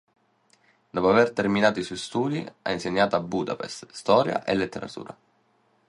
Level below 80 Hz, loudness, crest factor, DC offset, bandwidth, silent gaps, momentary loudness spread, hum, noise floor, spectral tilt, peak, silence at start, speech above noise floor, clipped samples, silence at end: -60 dBFS; -25 LUFS; 20 dB; under 0.1%; 11.5 kHz; none; 14 LU; none; -66 dBFS; -5.5 dB/octave; -6 dBFS; 0.95 s; 41 dB; under 0.1%; 0.75 s